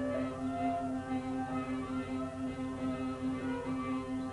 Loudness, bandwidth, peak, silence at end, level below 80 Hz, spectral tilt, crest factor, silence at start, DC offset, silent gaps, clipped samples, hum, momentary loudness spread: -37 LUFS; 11 kHz; -24 dBFS; 0 s; -58 dBFS; -7 dB/octave; 14 dB; 0 s; under 0.1%; none; under 0.1%; none; 3 LU